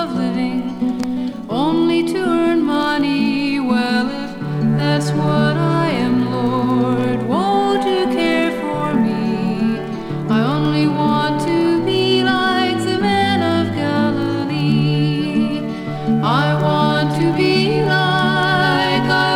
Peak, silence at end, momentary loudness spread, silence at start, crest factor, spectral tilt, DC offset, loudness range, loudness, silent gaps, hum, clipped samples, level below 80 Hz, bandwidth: -2 dBFS; 0 s; 5 LU; 0 s; 14 dB; -6.5 dB/octave; under 0.1%; 2 LU; -17 LUFS; none; none; under 0.1%; -48 dBFS; 13 kHz